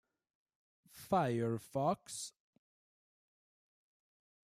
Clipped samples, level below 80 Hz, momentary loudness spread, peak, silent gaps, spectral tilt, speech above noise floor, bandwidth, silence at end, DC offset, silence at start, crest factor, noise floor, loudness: under 0.1%; -76 dBFS; 13 LU; -20 dBFS; none; -5.5 dB/octave; over 54 dB; 15.5 kHz; 2.15 s; under 0.1%; 0.95 s; 20 dB; under -90 dBFS; -37 LUFS